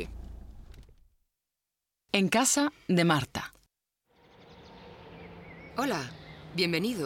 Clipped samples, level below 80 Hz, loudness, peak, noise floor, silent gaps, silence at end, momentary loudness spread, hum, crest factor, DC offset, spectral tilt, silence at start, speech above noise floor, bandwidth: under 0.1%; -54 dBFS; -28 LUFS; -10 dBFS; -87 dBFS; none; 0 s; 25 LU; none; 22 dB; under 0.1%; -4 dB/octave; 0 s; 60 dB; 17 kHz